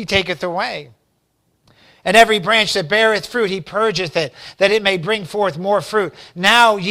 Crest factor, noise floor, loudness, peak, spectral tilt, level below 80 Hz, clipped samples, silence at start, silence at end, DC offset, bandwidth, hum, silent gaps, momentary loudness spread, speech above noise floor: 18 dB; -65 dBFS; -16 LUFS; 0 dBFS; -3.5 dB/octave; -50 dBFS; 0.2%; 0 s; 0 s; under 0.1%; over 20 kHz; none; none; 11 LU; 48 dB